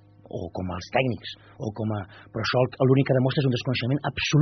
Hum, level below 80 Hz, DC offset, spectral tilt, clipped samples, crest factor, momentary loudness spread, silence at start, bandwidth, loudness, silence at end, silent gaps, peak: none; -56 dBFS; under 0.1%; -5.5 dB/octave; under 0.1%; 18 dB; 14 LU; 0.35 s; 6.4 kHz; -25 LUFS; 0 s; none; -8 dBFS